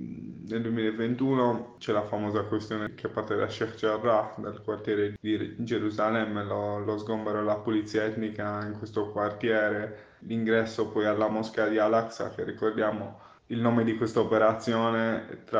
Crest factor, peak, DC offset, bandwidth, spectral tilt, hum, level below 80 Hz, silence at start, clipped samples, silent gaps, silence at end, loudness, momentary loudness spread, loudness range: 18 dB; -10 dBFS; under 0.1%; 7.8 kHz; -7 dB/octave; none; -66 dBFS; 0 s; under 0.1%; none; 0 s; -29 LUFS; 9 LU; 2 LU